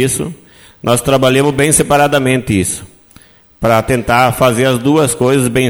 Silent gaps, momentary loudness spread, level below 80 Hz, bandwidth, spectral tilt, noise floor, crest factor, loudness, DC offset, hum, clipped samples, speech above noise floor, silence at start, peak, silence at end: none; 9 LU; -36 dBFS; over 20 kHz; -4.5 dB/octave; -44 dBFS; 12 dB; -12 LUFS; under 0.1%; none; under 0.1%; 32 dB; 0 s; 0 dBFS; 0 s